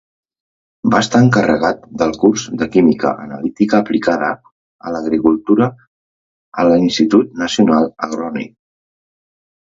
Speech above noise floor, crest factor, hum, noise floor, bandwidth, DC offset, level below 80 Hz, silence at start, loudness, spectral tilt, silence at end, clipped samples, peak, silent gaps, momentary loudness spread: over 76 dB; 16 dB; none; under -90 dBFS; 7.8 kHz; under 0.1%; -50 dBFS; 0.85 s; -15 LUFS; -6 dB/octave; 1.25 s; under 0.1%; 0 dBFS; 4.52-4.79 s, 5.87-6.52 s; 12 LU